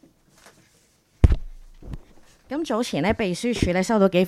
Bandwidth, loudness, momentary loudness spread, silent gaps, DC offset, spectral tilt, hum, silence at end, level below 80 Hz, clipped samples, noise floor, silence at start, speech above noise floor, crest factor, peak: 14 kHz; -23 LUFS; 21 LU; none; under 0.1%; -6 dB/octave; none; 0 s; -30 dBFS; under 0.1%; -61 dBFS; 1.2 s; 39 dB; 24 dB; 0 dBFS